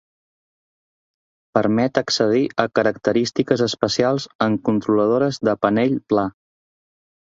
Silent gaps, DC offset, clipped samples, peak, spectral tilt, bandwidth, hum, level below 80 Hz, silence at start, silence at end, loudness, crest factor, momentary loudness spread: 4.35-4.39 s; under 0.1%; under 0.1%; -2 dBFS; -5.5 dB/octave; 7.8 kHz; none; -58 dBFS; 1.55 s; 0.9 s; -19 LUFS; 20 dB; 3 LU